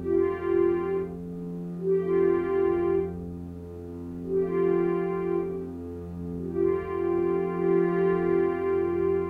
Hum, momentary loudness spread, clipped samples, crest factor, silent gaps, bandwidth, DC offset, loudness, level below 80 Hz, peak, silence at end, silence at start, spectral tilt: none; 13 LU; under 0.1%; 12 dB; none; 3.7 kHz; under 0.1%; -27 LUFS; -52 dBFS; -14 dBFS; 0 s; 0 s; -10 dB/octave